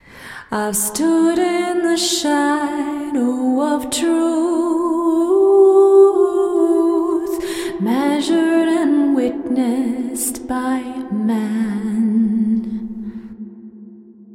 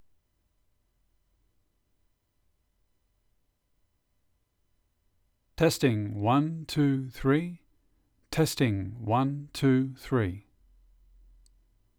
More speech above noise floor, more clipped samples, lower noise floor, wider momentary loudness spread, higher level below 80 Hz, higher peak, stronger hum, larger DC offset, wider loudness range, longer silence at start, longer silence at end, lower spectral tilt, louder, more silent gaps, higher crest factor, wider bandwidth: second, 23 dB vs 47 dB; neither; second, -40 dBFS vs -73 dBFS; first, 11 LU vs 7 LU; about the same, -54 dBFS vs -56 dBFS; first, -2 dBFS vs -12 dBFS; neither; neither; about the same, 6 LU vs 4 LU; second, 0.15 s vs 5.6 s; second, 0 s vs 1.6 s; second, -4.5 dB/octave vs -6.5 dB/octave; first, -17 LUFS vs -28 LUFS; neither; about the same, 16 dB vs 20 dB; second, 16.5 kHz vs 18.5 kHz